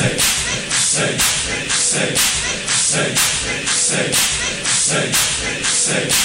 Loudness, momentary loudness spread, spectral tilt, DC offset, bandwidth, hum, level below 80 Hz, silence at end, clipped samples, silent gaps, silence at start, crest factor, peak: -15 LUFS; 3 LU; -1 dB/octave; 0.1%; 16.5 kHz; none; -40 dBFS; 0 s; under 0.1%; none; 0 s; 14 dB; -4 dBFS